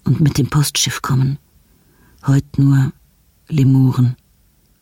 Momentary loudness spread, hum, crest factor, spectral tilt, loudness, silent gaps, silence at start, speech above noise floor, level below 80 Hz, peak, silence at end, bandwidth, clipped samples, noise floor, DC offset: 9 LU; none; 12 dB; -5.5 dB/octave; -16 LUFS; none; 0.05 s; 41 dB; -44 dBFS; -4 dBFS; 0.7 s; 17 kHz; under 0.1%; -55 dBFS; under 0.1%